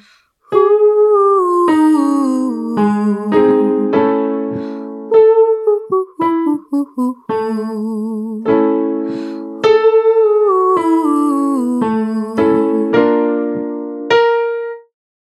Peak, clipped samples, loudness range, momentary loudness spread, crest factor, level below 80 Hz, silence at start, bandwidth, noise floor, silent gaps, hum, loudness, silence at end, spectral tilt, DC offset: 0 dBFS; under 0.1%; 4 LU; 10 LU; 14 dB; -60 dBFS; 0.5 s; 12 kHz; -50 dBFS; none; none; -14 LUFS; 0.4 s; -7 dB/octave; under 0.1%